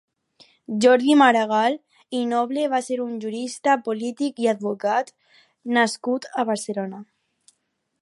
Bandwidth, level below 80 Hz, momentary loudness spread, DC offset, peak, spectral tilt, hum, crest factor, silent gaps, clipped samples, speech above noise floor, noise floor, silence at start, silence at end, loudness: 11.5 kHz; -76 dBFS; 15 LU; under 0.1%; -2 dBFS; -4 dB/octave; none; 20 dB; none; under 0.1%; 53 dB; -74 dBFS; 0.7 s; 1 s; -22 LUFS